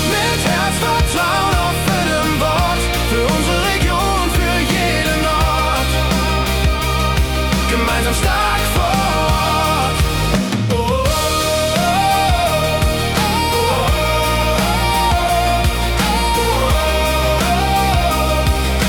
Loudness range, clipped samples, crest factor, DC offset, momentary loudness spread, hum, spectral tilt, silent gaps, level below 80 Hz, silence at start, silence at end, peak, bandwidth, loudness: 1 LU; under 0.1%; 12 dB; under 0.1%; 2 LU; none; -4 dB/octave; none; -22 dBFS; 0 s; 0 s; -4 dBFS; 18 kHz; -15 LUFS